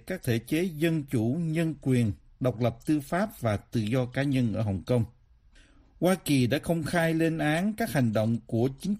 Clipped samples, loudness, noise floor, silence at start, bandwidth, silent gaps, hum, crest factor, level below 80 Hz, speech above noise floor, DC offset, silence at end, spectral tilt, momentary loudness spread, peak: under 0.1%; -28 LUFS; -57 dBFS; 0.05 s; 15.5 kHz; none; none; 16 dB; -54 dBFS; 31 dB; under 0.1%; 0 s; -6.5 dB/octave; 5 LU; -12 dBFS